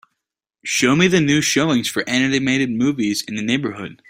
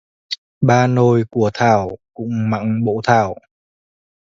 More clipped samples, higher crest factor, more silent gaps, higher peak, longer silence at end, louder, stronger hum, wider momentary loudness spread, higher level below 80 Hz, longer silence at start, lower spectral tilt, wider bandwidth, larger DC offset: neither; about the same, 18 dB vs 18 dB; second, none vs 0.38-0.61 s; about the same, -2 dBFS vs 0 dBFS; second, 0.15 s vs 0.95 s; about the same, -18 LUFS vs -16 LUFS; neither; second, 7 LU vs 15 LU; about the same, -54 dBFS vs -50 dBFS; first, 0.65 s vs 0.3 s; second, -4 dB/octave vs -7 dB/octave; first, 16 kHz vs 7.6 kHz; neither